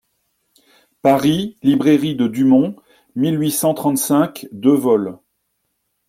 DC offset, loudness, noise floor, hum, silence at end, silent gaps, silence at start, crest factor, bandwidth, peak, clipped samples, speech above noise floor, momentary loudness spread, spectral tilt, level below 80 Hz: under 0.1%; -17 LUFS; -71 dBFS; none; 0.95 s; none; 1.05 s; 16 dB; 16.5 kHz; -2 dBFS; under 0.1%; 55 dB; 7 LU; -5.5 dB/octave; -58 dBFS